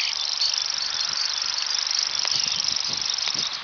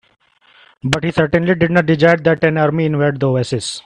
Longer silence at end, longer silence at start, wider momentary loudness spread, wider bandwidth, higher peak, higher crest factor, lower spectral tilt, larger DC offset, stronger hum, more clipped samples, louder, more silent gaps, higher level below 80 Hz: about the same, 0 s vs 0.05 s; second, 0 s vs 0.85 s; second, 2 LU vs 7 LU; second, 5.4 kHz vs 11 kHz; second, -6 dBFS vs 0 dBFS; about the same, 18 dB vs 16 dB; second, 2 dB/octave vs -6 dB/octave; neither; neither; neither; second, -20 LUFS vs -15 LUFS; neither; second, -64 dBFS vs -46 dBFS